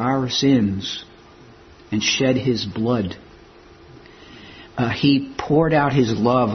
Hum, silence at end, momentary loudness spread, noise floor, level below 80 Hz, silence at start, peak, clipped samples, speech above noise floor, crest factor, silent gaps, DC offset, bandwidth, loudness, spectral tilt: none; 0 s; 13 LU; -46 dBFS; -50 dBFS; 0 s; -4 dBFS; under 0.1%; 27 dB; 18 dB; none; under 0.1%; 6.4 kHz; -20 LUFS; -5.5 dB/octave